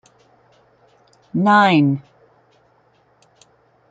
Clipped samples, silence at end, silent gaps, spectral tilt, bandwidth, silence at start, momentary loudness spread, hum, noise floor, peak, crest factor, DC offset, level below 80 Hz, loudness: under 0.1%; 1.9 s; none; -7 dB/octave; 7.8 kHz; 1.35 s; 15 LU; none; -58 dBFS; -2 dBFS; 18 dB; under 0.1%; -66 dBFS; -16 LUFS